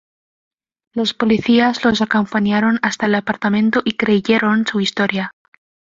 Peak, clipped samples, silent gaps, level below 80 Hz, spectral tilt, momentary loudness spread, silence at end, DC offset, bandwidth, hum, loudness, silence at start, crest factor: -2 dBFS; under 0.1%; none; -54 dBFS; -5.5 dB/octave; 6 LU; 0.6 s; under 0.1%; 7.6 kHz; none; -16 LUFS; 0.95 s; 16 dB